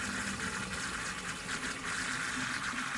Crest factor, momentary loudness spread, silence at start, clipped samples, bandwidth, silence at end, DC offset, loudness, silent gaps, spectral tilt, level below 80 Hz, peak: 14 dB; 3 LU; 0 s; under 0.1%; 12 kHz; 0 s; under 0.1%; -35 LUFS; none; -2 dB/octave; -56 dBFS; -22 dBFS